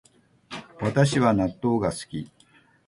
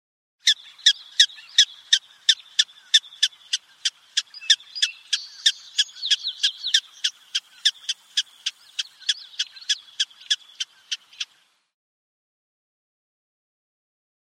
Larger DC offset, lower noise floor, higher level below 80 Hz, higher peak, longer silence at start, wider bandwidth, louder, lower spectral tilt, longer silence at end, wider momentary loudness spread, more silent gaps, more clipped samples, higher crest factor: neither; about the same, -59 dBFS vs -62 dBFS; first, -52 dBFS vs under -90 dBFS; second, -8 dBFS vs 0 dBFS; about the same, 0.5 s vs 0.45 s; second, 11.5 kHz vs 15 kHz; about the same, -24 LUFS vs -22 LUFS; first, -6.5 dB/octave vs 8 dB/octave; second, 0.6 s vs 3.15 s; first, 20 LU vs 12 LU; neither; neither; second, 18 dB vs 26 dB